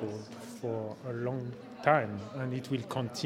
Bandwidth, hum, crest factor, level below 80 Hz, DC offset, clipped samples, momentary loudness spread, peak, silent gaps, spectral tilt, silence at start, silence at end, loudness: 16 kHz; none; 26 dB; -74 dBFS; under 0.1%; under 0.1%; 13 LU; -8 dBFS; none; -6 dB/octave; 0 s; 0 s; -34 LUFS